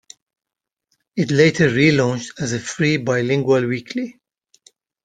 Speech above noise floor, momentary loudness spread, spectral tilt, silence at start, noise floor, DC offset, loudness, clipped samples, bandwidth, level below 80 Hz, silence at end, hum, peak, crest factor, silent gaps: 68 dB; 13 LU; -5.5 dB/octave; 1.15 s; -86 dBFS; under 0.1%; -18 LUFS; under 0.1%; 9.4 kHz; -56 dBFS; 0.95 s; none; -2 dBFS; 18 dB; none